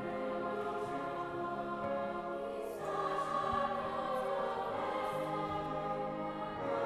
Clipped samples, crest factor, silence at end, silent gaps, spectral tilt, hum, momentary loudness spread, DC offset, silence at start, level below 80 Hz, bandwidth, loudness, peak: under 0.1%; 14 dB; 0 s; none; -6 dB/octave; none; 5 LU; under 0.1%; 0 s; -64 dBFS; 14 kHz; -38 LUFS; -22 dBFS